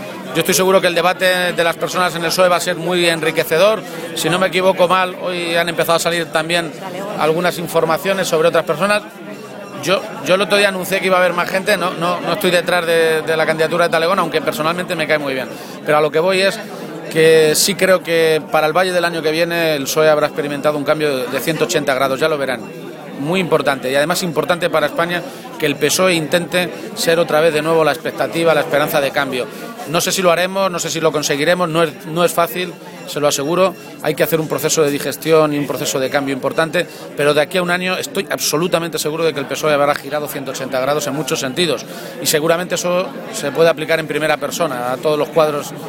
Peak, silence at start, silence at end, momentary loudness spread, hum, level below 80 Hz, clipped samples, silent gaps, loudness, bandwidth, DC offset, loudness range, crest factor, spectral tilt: 0 dBFS; 0 s; 0 s; 8 LU; none; -58 dBFS; under 0.1%; none; -16 LUFS; 17 kHz; under 0.1%; 3 LU; 16 dB; -3.5 dB/octave